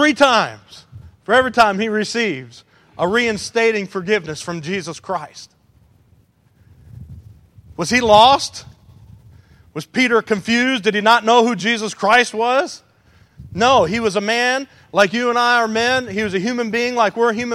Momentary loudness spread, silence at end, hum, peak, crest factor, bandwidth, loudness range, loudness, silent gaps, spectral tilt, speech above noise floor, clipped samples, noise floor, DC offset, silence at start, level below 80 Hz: 14 LU; 0 s; none; 0 dBFS; 18 dB; 14.5 kHz; 8 LU; -16 LUFS; none; -3.5 dB/octave; 38 dB; under 0.1%; -55 dBFS; under 0.1%; 0 s; -50 dBFS